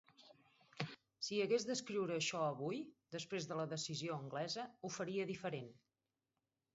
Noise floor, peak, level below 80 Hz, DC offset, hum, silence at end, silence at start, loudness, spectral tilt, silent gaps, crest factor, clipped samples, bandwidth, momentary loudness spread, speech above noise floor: under -90 dBFS; -22 dBFS; -86 dBFS; under 0.1%; none; 1 s; 0.2 s; -43 LUFS; -4 dB/octave; none; 22 dB; under 0.1%; 7.6 kHz; 10 LU; over 48 dB